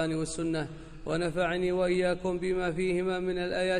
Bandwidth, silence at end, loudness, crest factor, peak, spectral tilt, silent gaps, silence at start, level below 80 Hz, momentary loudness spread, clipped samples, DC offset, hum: 11 kHz; 0 s; -30 LUFS; 12 dB; -16 dBFS; -5.5 dB/octave; none; 0 s; -48 dBFS; 6 LU; under 0.1%; under 0.1%; none